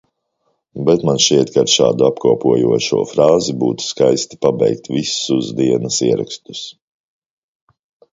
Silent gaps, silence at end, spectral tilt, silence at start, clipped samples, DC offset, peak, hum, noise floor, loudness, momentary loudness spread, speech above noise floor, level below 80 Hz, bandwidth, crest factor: none; 1.4 s; -4.5 dB/octave; 0.75 s; under 0.1%; under 0.1%; 0 dBFS; none; -67 dBFS; -15 LUFS; 8 LU; 52 dB; -54 dBFS; 7.8 kHz; 16 dB